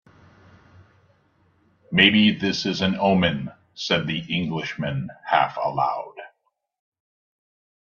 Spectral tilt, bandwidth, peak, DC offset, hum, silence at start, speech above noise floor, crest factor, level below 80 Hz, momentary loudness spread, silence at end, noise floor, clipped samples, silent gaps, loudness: -5.5 dB/octave; 7.2 kHz; 0 dBFS; under 0.1%; none; 1.9 s; 49 dB; 24 dB; -58 dBFS; 16 LU; 1.65 s; -71 dBFS; under 0.1%; none; -22 LUFS